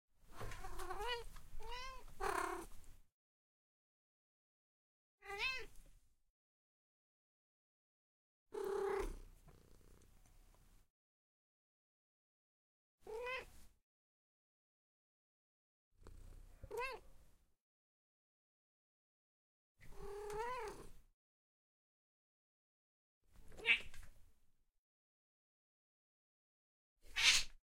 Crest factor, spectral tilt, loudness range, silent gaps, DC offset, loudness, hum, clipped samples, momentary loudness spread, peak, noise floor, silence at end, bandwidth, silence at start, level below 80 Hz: 32 dB; -1 dB/octave; 11 LU; 3.12-5.18 s, 6.30-8.46 s, 10.90-12.98 s, 13.83-15.91 s, 17.61-19.75 s, 21.14-23.21 s, 24.78-26.96 s; under 0.1%; -41 LUFS; none; under 0.1%; 24 LU; -16 dBFS; -72 dBFS; 0.05 s; 16.5 kHz; 0.25 s; -60 dBFS